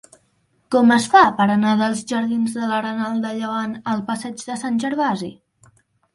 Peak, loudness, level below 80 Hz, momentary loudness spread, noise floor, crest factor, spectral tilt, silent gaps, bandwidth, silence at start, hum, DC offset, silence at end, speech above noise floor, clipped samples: 0 dBFS; -19 LUFS; -62 dBFS; 14 LU; -64 dBFS; 20 dB; -5 dB/octave; none; 11.5 kHz; 0.7 s; none; under 0.1%; 0.8 s; 45 dB; under 0.1%